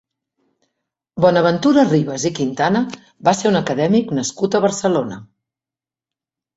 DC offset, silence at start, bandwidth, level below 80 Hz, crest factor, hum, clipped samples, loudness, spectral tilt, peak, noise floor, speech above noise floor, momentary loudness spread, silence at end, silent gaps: under 0.1%; 1.15 s; 8.2 kHz; -58 dBFS; 18 dB; none; under 0.1%; -17 LUFS; -5.5 dB/octave; -2 dBFS; -90 dBFS; 73 dB; 8 LU; 1.35 s; none